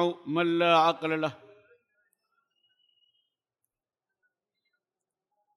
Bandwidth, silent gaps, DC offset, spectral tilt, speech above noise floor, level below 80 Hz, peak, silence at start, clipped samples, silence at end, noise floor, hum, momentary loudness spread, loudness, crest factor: 12 kHz; none; under 0.1%; -6 dB/octave; 64 dB; -86 dBFS; -12 dBFS; 0 s; under 0.1%; 4.2 s; -90 dBFS; none; 9 LU; -26 LUFS; 20 dB